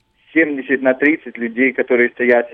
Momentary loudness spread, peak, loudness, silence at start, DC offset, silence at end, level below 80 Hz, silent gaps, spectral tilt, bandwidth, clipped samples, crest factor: 5 LU; 0 dBFS; -16 LUFS; 0.35 s; under 0.1%; 0.05 s; -66 dBFS; none; -8 dB/octave; 4.6 kHz; under 0.1%; 16 dB